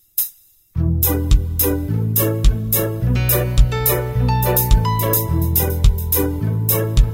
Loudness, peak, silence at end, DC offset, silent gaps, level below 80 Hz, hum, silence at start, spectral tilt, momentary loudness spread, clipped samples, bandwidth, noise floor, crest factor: -18 LUFS; 0 dBFS; 0 s; under 0.1%; none; -20 dBFS; none; 0.15 s; -5.5 dB/octave; 5 LU; under 0.1%; 16.5 kHz; -43 dBFS; 16 dB